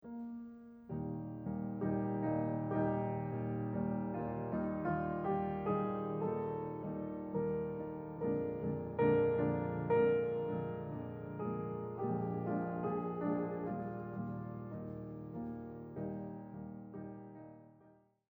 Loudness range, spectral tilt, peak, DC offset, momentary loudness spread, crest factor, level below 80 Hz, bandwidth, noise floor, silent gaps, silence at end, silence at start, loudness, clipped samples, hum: 10 LU; -11.5 dB/octave; -20 dBFS; under 0.1%; 13 LU; 18 dB; -64 dBFS; 4.1 kHz; -66 dBFS; none; 0.4 s; 0.05 s; -39 LUFS; under 0.1%; none